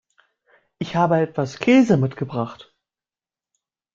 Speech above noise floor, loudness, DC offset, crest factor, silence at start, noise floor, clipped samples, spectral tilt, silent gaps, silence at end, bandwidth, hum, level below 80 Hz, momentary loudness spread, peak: over 71 dB; -20 LUFS; under 0.1%; 18 dB; 0.8 s; under -90 dBFS; under 0.1%; -7 dB/octave; none; 1.4 s; 7.6 kHz; none; -60 dBFS; 13 LU; -4 dBFS